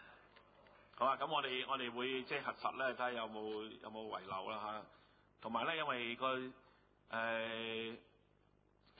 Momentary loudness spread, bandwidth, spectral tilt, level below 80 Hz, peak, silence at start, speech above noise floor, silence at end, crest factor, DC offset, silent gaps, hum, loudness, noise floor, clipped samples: 12 LU; 4.8 kHz; -1 dB/octave; -80 dBFS; -22 dBFS; 0 s; 32 dB; 1 s; 20 dB; under 0.1%; none; none; -41 LUFS; -73 dBFS; under 0.1%